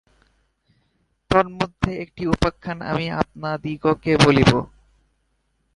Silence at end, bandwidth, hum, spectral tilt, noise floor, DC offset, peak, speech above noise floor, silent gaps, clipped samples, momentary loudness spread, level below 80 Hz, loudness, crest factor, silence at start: 1.1 s; 11.5 kHz; none; -6 dB/octave; -69 dBFS; under 0.1%; 0 dBFS; 49 dB; none; under 0.1%; 12 LU; -40 dBFS; -21 LUFS; 22 dB; 1.3 s